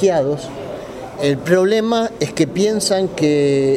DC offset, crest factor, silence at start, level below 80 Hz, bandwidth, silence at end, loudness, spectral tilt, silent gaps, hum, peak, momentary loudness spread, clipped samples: under 0.1%; 16 dB; 0 s; -50 dBFS; 15.5 kHz; 0 s; -17 LUFS; -5 dB/octave; none; none; -2 dBFS; 14 LU; under 0.1%